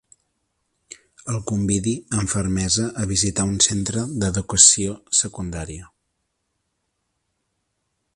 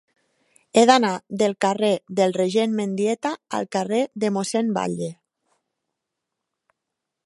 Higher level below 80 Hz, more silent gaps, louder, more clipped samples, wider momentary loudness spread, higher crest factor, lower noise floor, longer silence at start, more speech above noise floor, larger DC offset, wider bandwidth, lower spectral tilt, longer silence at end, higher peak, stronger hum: first, -42 dBFS vs -72 dBFS; neither; first, -19 LUFS vs -22 LUFS; neither; first, 18 LU vs 10 LU; about the same, 24 dB vs 22 dB; second, -75 dBFS vs -83 dBFS; first, 1.25 s vs 0.75 s; second, 54 dB vs 62 dB; neither; about the same, 11.5 kHz vs 11.5 kHz; second, -3 dB/octave vs -4.5 dB/octave; first, 2.3 s vs 2.15 s; about the same, 0 dBFS vs -2 dBFS; neither